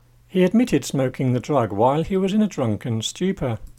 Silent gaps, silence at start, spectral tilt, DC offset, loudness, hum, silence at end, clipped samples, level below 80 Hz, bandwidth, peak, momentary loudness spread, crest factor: none; 0.35 s; -6.5 dB/octave; under 0.1%; -21 LUFS; none; 0.15 s; under 0.1%; -46 dBFS; 15.5 kHz; -4 dBFS; 6 LU; 16 dB